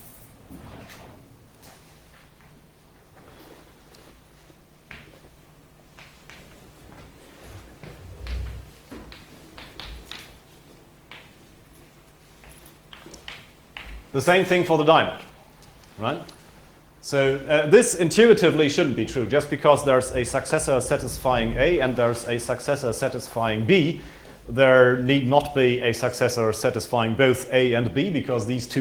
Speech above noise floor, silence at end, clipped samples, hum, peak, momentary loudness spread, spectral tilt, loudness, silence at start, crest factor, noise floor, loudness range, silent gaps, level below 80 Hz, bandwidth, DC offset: 33 dB; 0 s; under 0.1%; none; -2 dBFS; 26 LU; -5 dB/octave; -21 LUFS; 0.05 s; 22 dB; -54 dBFS; 22 LU; none; -46 dBFS; over 20 kHz; under 0.1%